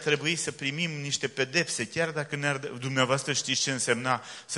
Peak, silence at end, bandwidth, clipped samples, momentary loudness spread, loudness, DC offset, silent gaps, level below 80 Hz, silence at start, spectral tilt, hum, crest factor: -8 dBFS; 0 s; 11.5 kHz; under 0.1%; 5 LU; -28 LUFS; under 0.1%; none; -70 dBFS; 0 s; -3 dB/octave; none; 22 dB